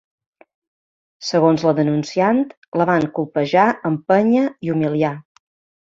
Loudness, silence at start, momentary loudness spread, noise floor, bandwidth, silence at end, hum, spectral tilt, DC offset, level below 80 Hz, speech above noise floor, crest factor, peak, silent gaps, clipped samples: -18 LUFS; 1.2 s; 7 LU; under -90 dBFS; 7.6 kHz; 0.65 s; none; -7 dB/octave; under 0.1%; -62 dBFS; over 73 dB; 18 dB; -2 dBFS; 2.57-2.62 s, 2.68-2.72 s; under 0.1%